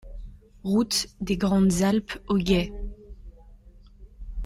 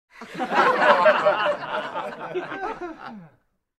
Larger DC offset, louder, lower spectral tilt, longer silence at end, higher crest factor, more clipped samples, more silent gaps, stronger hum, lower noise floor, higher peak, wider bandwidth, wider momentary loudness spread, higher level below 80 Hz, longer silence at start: neither; second, -25 LUFS vs -22 LUFS; about the same, -5 dB/octave vs -4.5 dB/octave; second, 0 s vs 0.55 s; about the same, 18 dB vs 22 dB; neither; neither; neither; second, -50 dBFS vs -61 dBFS; second, -8 dBFS vs -2 dBFS; first, 16 kHz vs 12 kHz; about the same, 20 LU vs 19 LU; first, -40 dBFS vs -62 dBFS; about the same, 0.05 s vs 0.15 s